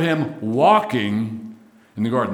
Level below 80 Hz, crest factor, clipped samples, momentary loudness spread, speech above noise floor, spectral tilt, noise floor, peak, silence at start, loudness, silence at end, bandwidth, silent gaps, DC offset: -68 dBFS; 18 dB; under 0.1%; 20 LU; 25 dB; -7 dB/octave; -44 dBFS; -2 dBFS; 0 s; -20 LUFS; 0 s; 15 kHz; none; under 0.1%